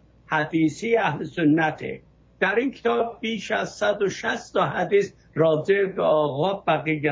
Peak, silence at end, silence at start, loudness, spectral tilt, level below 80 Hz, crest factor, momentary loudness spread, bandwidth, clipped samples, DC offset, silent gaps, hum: -8 dBFS; 0 s; 0.3 s; -23 LUFS; -6 dB/octave; -58 dBFS; 16 dB; 6 LU; 7.8 kHz; under 0.1%; under 0.1%; none; none